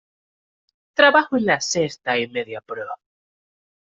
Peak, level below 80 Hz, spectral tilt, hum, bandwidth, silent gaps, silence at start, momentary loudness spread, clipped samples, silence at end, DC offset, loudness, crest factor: -2 dBFS; -66 dBFS; -3 dB/octave; none; 8 kHz; none; 1 s; 17 LU; under 0.1%; 1 s; under 0.1%; -19 LUFS; 20 dB